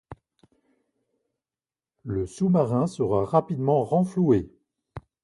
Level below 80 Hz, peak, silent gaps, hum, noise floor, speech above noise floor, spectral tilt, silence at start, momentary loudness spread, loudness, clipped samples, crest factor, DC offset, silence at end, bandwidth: -52 dBFS; -6 dBFS; none; none; under -90 dBFS; over 67 dB; -9 dB/octave; 0.1 s; 21 LU; -24 LUFS; under 0.1%; 20 dB; under 0.1%; 0.25 s; 11.5 kHz